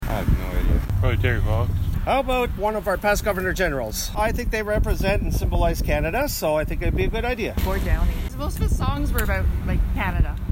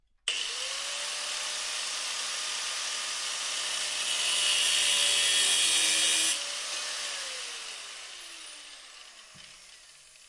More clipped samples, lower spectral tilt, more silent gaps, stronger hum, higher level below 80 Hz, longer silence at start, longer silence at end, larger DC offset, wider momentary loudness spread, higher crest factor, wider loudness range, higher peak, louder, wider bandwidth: neither; first, -5.5 dB/octave vs 3 dB/octave; neither; neither; first, -24 dBFS vs -72 dBFS; second, 0 s vs 0.25 s; about the same, 0 s vs 0 s; neither; second, 4 LU vs 21 LU; about the same, 14 dB vs 18 dB; second, 2 LU vs 12 LU; first, -6 dBFS vs -12 dBFS; first, -23 LUFS vs -27 LUFS; first, 16.5 kHz vs 11.5 kHz